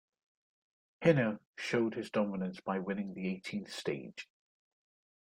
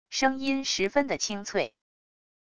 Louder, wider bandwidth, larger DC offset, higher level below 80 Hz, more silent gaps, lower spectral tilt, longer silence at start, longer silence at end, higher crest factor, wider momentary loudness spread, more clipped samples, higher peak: second, -35 LUFS vs -28 LUFS; first, 14 kHz vs 10.5 kHz; neither; second, -74 dBFS vs -60 dBFS; first, 1.46-1.54 s vs none; first, -6.5 dB/octave vs -2.5 dB/octave; first, 1 s vs 0.05 s; first, 1.05 s vs 0.65 s; about the same, 24 dB vs 20 dB; first, 12 LU vs 5 LU; neither; about the same, -12 dBFS vs -10 dBFS